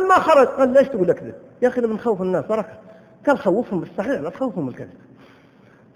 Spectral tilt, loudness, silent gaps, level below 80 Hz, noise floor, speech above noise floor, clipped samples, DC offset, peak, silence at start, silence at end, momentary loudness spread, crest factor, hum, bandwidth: -6.5 dB/octave; -20 LUFS; none; -58 dBFS; -51 dBFS; 31 dB; under 0.1%; under 0.1%; -4 dBFS; 0 s; 1.1 s; 15 LU; 18 dB; none; 15 kHz